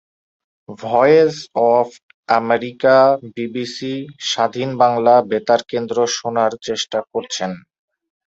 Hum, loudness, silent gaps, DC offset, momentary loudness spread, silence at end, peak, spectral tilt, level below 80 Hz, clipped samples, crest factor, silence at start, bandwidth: none; -17 LUFS; 2.03-2.23 s; under 0.1%; 12 LU; 0.7 s; -2 dBFS; -4 dB/octave; -64 dBFS; under 0.1%; 16 dB; 0.7 s; 8 kHz